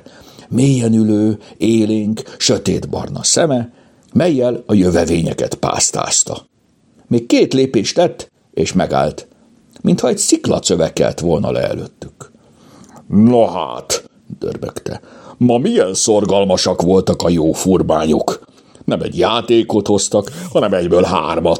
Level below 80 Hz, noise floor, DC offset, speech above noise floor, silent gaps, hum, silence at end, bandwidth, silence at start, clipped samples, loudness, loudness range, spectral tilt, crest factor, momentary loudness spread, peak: -46 dBFS; -53 dBFS; under 0.1%; 39 dB; none; none; 0 s; 16.5 kHz; 0.4 s; under 0.1%; -15 LUFS; 3 LU; -4.5 dB/octave; 16 dB; 11 LU; 0 dBFS